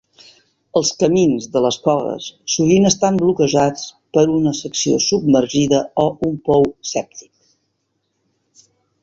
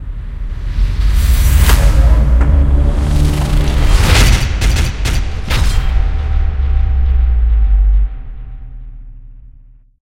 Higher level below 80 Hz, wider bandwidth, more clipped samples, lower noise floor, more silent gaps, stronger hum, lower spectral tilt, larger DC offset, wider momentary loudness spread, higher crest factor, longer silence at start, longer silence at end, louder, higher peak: second, -52 dBFS vs -12 dBFS; second, 7.8 kHz vs 16.5 kHz; neither; first, -70 dBFS vs -41 dBFS; neither; neither; about the same, -5 dB/octave vs -5 dB/octave; neither; second, 8 LU vs 15 LU; about the same, 16 dB vs 12 dB; first, 0.75 s vs 0 s; first, 1.85 s vs 0.6 s; second, -17 LUFS vs -14 LUFS; about the same, -2 dBFS vs 0 dBFS